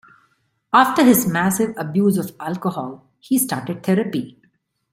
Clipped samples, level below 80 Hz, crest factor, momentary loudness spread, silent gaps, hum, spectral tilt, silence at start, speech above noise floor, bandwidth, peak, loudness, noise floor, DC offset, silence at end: under 0.1%; -60 dBFS; 18 dB; 13 LU; none; none; -5 dB/octave; 0.75 s; 46 dB; 16.5 kHz; 0 dBFS; -19 LUFS; -64 dBFS; under 0.1%; 0.6 s